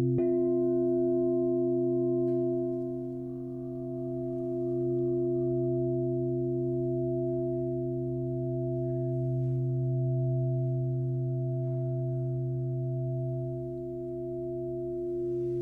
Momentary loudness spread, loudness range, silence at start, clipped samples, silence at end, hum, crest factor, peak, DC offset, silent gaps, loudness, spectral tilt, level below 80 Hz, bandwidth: 8 LU; 4 LU; 0 s; under 0.1%; 0 s; none; 10 dB; -18 dBFS; under 0.1%; none; -31 LUFS; -13.5 dB/octave; -58 dBFS; 1.3 kHz